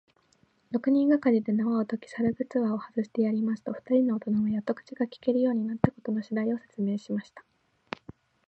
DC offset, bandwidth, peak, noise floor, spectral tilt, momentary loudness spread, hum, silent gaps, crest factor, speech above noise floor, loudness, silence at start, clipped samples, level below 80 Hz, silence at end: under 0.1%; 8 kHz; -6 dBFS; -67 dBFS; -9 dB/octave; 10 LU; none; none; 22 dB; 39 dB; -28 LUFS; 0.7 s; under 0.1%; -62 dBFS; 0.35 s